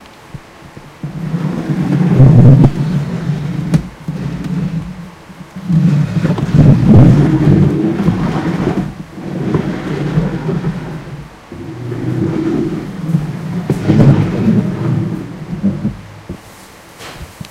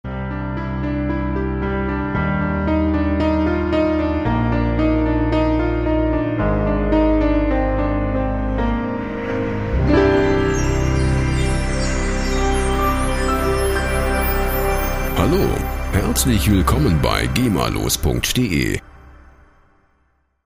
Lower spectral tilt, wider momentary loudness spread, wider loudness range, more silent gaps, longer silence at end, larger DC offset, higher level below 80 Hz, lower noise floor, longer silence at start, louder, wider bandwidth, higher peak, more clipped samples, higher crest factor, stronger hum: first, -9 dB/octave vs -5.5 dB/octave; first, 23 LU vs 6 LU; first, 9 LU vs 2 LU; neither; second, 0 s vs 1.35 s; neither; second, -32 dBFS vs -24 dBFS; second, -37 dBFS vs -63 dBFS; about the same, 0 s vs 0.05 s; first, -13 LUFS vs -19 LUFS; second, 10.5 kHz vs 16 kHz; about the same, 0 dBFS vs -2 dBFS; first, 0.5% vs under 0.1%; about the same, 14 dB vs 16 dB; neither